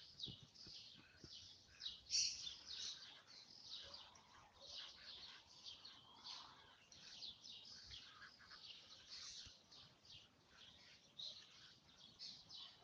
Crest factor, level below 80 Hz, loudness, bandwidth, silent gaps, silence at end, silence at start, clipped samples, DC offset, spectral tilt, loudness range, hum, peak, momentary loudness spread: 28 dB; -82 dBFS; -52 LUFS; 10 kHz; none; 0 s; 0 s; under 0.1%; under 0.1%; 0.5 dB/octave; 10 LU; none; -28 dBFS; 14 LU